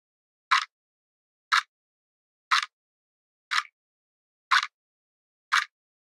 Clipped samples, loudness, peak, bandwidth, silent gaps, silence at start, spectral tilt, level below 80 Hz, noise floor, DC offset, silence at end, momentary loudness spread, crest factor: under 0.1%; -26 LUFS; -8 dBFS; 16 kHz; 0.72-1.51 s, 1.68-2.51 s, 2.73-3.51 s, 3.73-4.51 s, 4.74-5.51 s; 0.5 s; 7.5 dB/octave; under -90 dBFS; under -90 dBFS; under 0.1%; 0.45 s; 14 LU; 24 dB